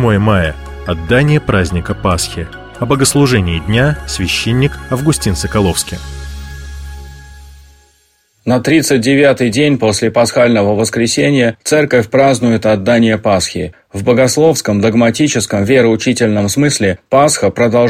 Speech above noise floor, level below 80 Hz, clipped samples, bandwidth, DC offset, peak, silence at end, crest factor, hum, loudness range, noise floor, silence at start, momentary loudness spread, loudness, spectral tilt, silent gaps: 44 dB; -32 dBFS; under 0.1%; 16 kHz; under 0.1%; 0 dBFS; 0 s; 12 dB; none; 6 LU; -55 dBFS; 0 s; 13 LU; -12 LUFS; -5 dB/octave; none